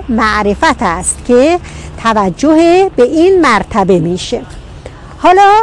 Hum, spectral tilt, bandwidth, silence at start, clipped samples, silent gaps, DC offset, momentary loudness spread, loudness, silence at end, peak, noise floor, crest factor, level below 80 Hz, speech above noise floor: none; -4.5 dB/octave; 12 kHz; 0 s; under 0.1%; none; under 0.1%; 10 LU; -10 LUFS; 0 s; 0 dBFS; -29 dBFS; 10 dB; -32 dBFS; 20 dB